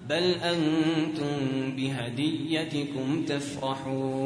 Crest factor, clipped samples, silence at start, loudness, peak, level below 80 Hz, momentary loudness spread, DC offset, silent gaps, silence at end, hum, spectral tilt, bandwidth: 16 dB; under 0.1%; 0 s; -29 LUFS; -12 dBFS; -64 dBFS; 6 LU; under 0.1%; none; 0 s; none; -5.5 dB/octave; 10.5 kHz